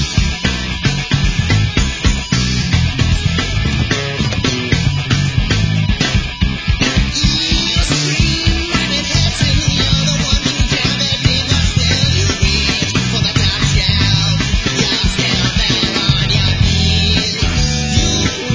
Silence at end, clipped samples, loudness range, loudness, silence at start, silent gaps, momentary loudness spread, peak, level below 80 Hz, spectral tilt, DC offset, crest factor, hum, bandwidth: 0 s; under 0.1%; 2 LU; -14 LUFS; 0 s; none; 3 LU; 0 dBFS; -20 dBFS; -4 dB/octave; under 0.1%; 14 dB; none; 8 kHz